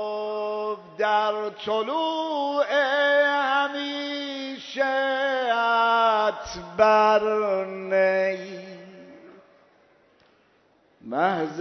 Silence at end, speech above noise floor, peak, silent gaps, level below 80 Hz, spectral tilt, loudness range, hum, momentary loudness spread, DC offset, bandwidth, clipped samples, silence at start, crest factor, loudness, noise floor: 0 s; 39 dB; -4 dBFS; none; -64 dBFS; -4 dB/octave; 8 LU; none; 13 LU; under 0.1%; 6.4 kHz; under 0.1%; 0 s; 20 dB; -23 LUFS; -62 dBFS